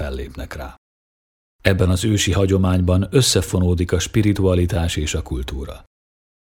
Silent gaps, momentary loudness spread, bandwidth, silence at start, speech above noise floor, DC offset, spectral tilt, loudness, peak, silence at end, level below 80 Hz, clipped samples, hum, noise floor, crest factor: 0.78-1.59 s; 15 LU; 17 kHz; 0 s; over 72 dB; under 0.1%; -5 dB/octave; -18 LUFS; 0 dBFS; 0.65 s; -32 dBFS; under 0.1%; none; under -90 dBFS; 20 dB